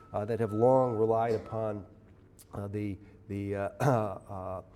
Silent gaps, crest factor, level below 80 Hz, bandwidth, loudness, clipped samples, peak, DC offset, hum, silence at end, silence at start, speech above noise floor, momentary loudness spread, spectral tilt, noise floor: none; 18 dB; -62 dBFS; 14.5 kHz; -31 LUFS; under 0.1%; -12 dBFS; under 0.1%; none; 0.1 s; 0 s; 26 dB; 16 LU; -8.5 dB/octave; -56 dBFS